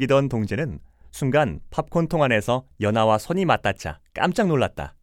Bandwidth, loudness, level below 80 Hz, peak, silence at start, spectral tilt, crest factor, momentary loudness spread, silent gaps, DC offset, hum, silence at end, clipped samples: 16.5 kHz; -23 LUFS; -46 dBFS; -4 dBFS; 0 s; -6.5 dB/octave; 18 dB; 10 LU; none; under 0.1%; none; 0.15 s; under 0.1%